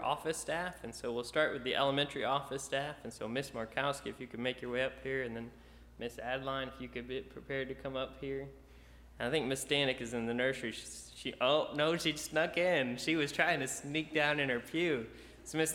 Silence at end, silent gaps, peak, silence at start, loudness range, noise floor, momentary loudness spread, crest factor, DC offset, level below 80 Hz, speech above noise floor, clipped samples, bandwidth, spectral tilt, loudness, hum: 0 s; none; -14 dBFS; 0 s; 8 LU; -57 dBFS; 12 LU; 22 dB; under 0.1%; -60 dBFS; 21 dB; under 0.1%; 17 kHz; -3.5 dB/octave; -35 LUFS; none